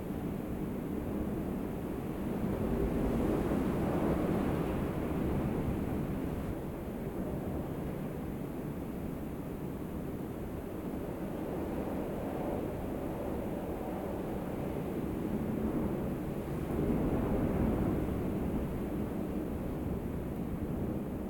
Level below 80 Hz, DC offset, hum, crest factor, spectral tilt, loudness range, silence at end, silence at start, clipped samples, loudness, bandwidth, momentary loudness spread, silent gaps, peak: -44 dBFS; under 0.1%; none; 16 dB; -8.5 dB/octave; 6 LU; 0 s; 0 s; under 0.1%; -36 LUFS; 17.5 kHz; 8 LU; none; -20 dBFS